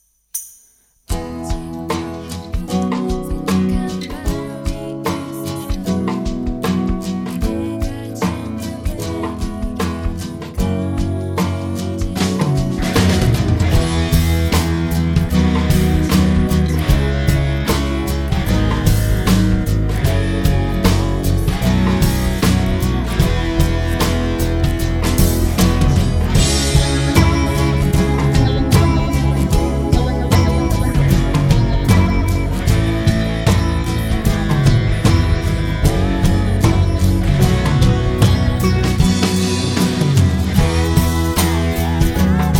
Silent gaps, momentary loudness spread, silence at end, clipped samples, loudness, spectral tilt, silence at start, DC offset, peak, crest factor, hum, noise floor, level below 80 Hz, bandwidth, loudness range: none; 9 LU; 0 s; under 0.1%; -17 LUFS; -6 dB/octave; 0.35 s; under 0.1%; 0 dBFS; 16 dB; none; -53 dBFS; -22 dBFS; 18 kHz; 7 LU